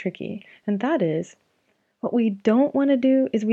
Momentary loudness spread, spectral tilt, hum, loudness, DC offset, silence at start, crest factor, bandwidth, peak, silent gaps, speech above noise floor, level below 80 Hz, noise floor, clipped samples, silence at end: 14 LU; -7.5 dB/octave; none; -22 LUFS; under 0.1%; 0 s; 16 dB; 7.8 kHz; -6 dBFS; none; 47 dB; -74 dBFS; -69 dBFS; under 0.1%; 0 s